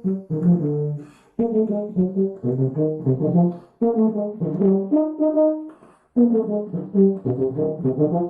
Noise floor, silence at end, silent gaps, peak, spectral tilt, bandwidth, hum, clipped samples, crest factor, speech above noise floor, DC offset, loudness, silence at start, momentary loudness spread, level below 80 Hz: -45 dBFS; 0 s; none; -6 dBFS; -13.5 dB/octave; 2.6 kHz; none; under 0.1%; 14 dB; 24 dB; under 0.1%; -21 LUFS; 0.05 s; 7 LU; -60 dBFS